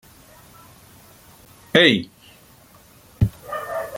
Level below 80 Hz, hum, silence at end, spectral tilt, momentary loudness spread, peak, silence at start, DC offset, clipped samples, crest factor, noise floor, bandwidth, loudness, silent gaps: -44 dBFS; none; 0 s; -5.5 dB/octave; 16 LU; 0 dBFS; 1.75 s; under 0.1%; under 0.1%; 24 dB; -50 dBFS; 17 kHz; -19 LUFS; none